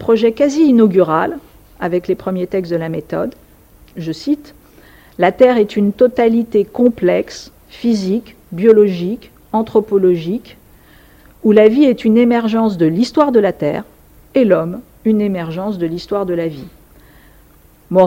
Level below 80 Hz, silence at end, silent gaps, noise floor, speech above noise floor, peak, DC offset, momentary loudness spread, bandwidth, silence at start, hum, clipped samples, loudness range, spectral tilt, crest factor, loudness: -48 dBFS; 0 s; none; -47 dBFS; 33 dB; 0 dBFS; under 0.1%; 13 LU; 16.5 kHz; 0 s; none; under 0.1%; 8 LU; -7.5 dB/octave; 14 dB; -15 LUFS